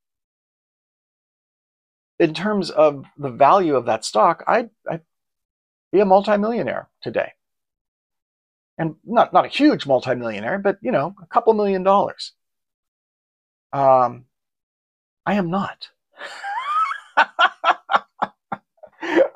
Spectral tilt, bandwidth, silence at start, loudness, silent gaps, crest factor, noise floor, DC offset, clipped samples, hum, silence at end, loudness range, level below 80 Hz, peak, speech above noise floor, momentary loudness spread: -5.5 dB/octave; 11.5 kHz; 2.2 s; -19 LUFS; 5.45-5.91 s, 7.81-8.10 s, 8.22-8.77 s, 12.74-13.70 s, 14.63-15.17 s; 18 dB; -41 dBFS; under 0.1%; under 0.1%; none; 0.05 s; 5 LU; -64 dBFS; -2 dBFS; 22 dB; 15 LU